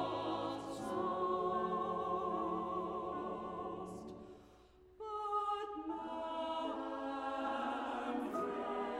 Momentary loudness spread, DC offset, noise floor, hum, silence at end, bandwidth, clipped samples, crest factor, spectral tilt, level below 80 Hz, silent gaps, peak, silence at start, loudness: 9 LU; under 0.1%; -63 dBFS; none; 0 s; 14 kHz; under 0.1%; 14 dB; -6 dB/octave; -68 dBFS; none; -26 dBFS; 0 s; -40 LUFS